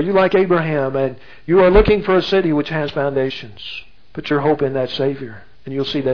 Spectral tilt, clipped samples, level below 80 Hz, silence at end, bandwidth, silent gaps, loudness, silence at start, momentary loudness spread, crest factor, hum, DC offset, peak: -7.5 dB/octave; under 0.1%; -32 dBFS; 0 s; 5.4 kHz; none; -17 LUFS; 0 s; 17 LU; 18 dB; none; 1%; 0 dBFS